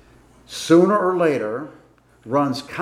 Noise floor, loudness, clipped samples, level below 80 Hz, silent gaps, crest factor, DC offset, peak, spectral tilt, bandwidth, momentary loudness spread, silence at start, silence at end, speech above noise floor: -50 dBFS; -19 LUFS; under 0.1%; -60 dBFS; none; 18 dB; under 0.1%; -2 dBFS; -6 dB/octave; 13.5 kHz; 17 LU; 0.5 s; 0 s; 32 dB